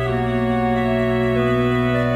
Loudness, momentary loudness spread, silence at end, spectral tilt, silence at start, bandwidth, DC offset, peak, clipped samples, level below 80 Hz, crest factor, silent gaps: -19 LUFS; 2 LU; 0 s; -8 dB/octave; 0 s; 12.5 kHz; under 0.1%; -8 dBFS; under 0.1%; -36 dBFS; 10 dB; none